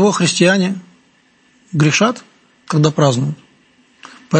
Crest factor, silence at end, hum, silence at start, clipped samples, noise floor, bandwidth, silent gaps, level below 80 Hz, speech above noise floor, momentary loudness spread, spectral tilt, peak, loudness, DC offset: 16 dB; 0 s; none; 0 s; under 0.1%; -54 dBFS; 8.8 kHz; none; -58 dBFS; 40 dB; 14 LU; -5 dB/octave; 0 dBFS; -15 LUFS; under 0.1%